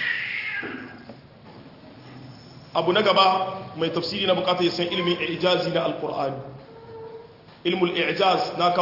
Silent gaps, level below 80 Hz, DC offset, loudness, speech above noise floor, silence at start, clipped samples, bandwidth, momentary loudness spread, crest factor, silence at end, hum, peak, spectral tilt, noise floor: none; -64 dBFS; under 0.1%; -23 LUFS; 23 dB; 0 s; under 0.1%; 5.8 kHz; 23 LU; 18 dB; 0 s; none; -6 dBFS; -5.5 dB/octave; -46 dBFS